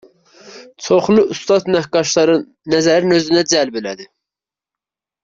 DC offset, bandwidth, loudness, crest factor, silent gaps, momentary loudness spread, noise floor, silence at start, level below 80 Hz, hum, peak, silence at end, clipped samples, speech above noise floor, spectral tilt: under 0.1%; 7.8 kHz; -15 LUFS; 14 dB; none; 11 LU; -88 dBFS; 0.45 s; -56 dBFS; none; -2 dBFS; 1.2 s; under 0.1%; 73 dB; -4 dB/octave